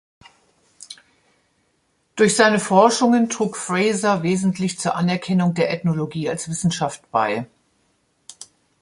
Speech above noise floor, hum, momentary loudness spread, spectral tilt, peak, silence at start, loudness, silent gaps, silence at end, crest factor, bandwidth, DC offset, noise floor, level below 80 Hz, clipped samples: 47 dB; none; 23 LU; -5 dB/octave; -2 dBFS; 0.8 s; -19 LUFS; none; 0.4 s; 20 dB; 11.5 kHz; under 0.1%; -66 dBFS; -60 dBFS; under 0.1%